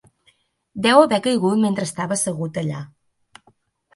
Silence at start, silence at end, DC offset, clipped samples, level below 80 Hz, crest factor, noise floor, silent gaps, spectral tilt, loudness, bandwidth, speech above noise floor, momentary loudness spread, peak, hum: 0.75 s; 1.1 s; under 0.1%; under 0.1%; -64 dBFS; 20 dB; -62 dBFS; none; -4.5 dB/octave; -19 LUFS; 11.5 kHz; 43 dB; 17 LU; 0 dBFS; none